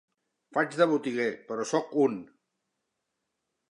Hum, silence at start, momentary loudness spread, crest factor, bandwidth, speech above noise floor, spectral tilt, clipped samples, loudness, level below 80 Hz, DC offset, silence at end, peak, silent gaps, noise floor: none; 0.5 s; 8 LU; 22 dB; 11 kHz; 55 dB; -5 dB/octave; under 0.1%; -28 LUFS; -82 dBFS; under 0.1%; 1.45 s; -8 dBFS; none; -83 dBFS